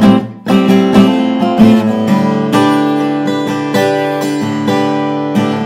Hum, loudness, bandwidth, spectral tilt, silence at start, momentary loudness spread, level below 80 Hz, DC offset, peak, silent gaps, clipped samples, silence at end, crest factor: none; -11 LUFS; 15.5 kHz; -6.5 dB/octave; 0 s; 7 LU; -46 dBFS; under 0.1%; 0 dBFS; none; 0.4%; 0 s; 10 dB